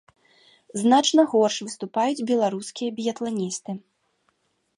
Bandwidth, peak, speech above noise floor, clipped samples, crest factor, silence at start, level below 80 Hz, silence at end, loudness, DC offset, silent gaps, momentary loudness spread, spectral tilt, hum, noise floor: 11.5 kHz; -6 dBFS; 47 dB; under 0.1%; 18 dB; 0.75 s; -76 dBFS; 1 s; -23 LUFS; under 0.1%; none; 13 LU; -4 dB/octave; none; -70 dBFS